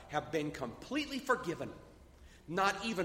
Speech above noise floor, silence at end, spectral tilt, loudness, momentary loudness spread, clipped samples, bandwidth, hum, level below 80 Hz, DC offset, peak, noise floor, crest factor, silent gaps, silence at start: 21 dB; 0 s; -4.5 dB/octave; -37 LUFS; 13 LU; under 0.1%; 16 kHz; none; -62 dBFS; under 0.1%; -16 dBFS; -58 dBFS; 20 dB; none; 0 s